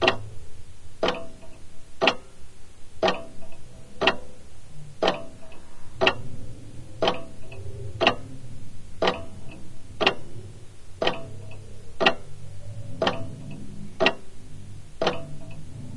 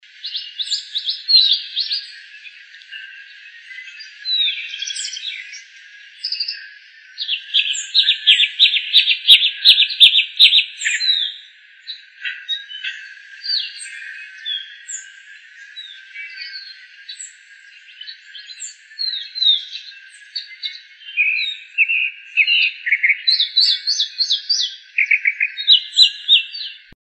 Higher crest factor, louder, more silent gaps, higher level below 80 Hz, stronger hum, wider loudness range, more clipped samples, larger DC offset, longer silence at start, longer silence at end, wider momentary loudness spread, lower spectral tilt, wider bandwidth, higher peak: first, 26 dB vs 20 dB; second, -26 LUFS vs -14 LUFS; neither; first, -48 dBFS vs -76 dBFS; neither; second, 2 LU vs 19 LU; neither; neither; second, 0 s vs 0.25 s; second, 0 s vs 0.3 s; about the same, 24 LU vs 24 LU; first, -4.5 dB/octave vs 7 dB/octave; first, 11.5 kHz vs 9.4 kHz; about the same, -2 dBFS vs 0 dBFS